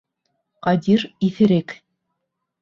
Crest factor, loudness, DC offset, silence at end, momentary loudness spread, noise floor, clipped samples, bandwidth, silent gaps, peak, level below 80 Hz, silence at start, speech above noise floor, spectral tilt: 16 dB; -19 LUFS; under 0.1%; 0.85 s; 15 LU; -78 dBFS; under 0.1%; 7.2 kHz; none; -4 dBFS; -60 dBFS; 0.65 s; 60 dB; -8 dB/octave